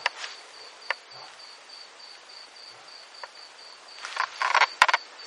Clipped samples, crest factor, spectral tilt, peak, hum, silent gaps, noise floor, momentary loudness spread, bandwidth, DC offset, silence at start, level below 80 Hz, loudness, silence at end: under 0.1%; 30 dB; 1.5 dB/octave; 0 dBFS; none; none; -47 dBFS; 22 LU; 16 kHz; under 0.1%; 0 s; -80 dBFS; -25 LUFS; 0 s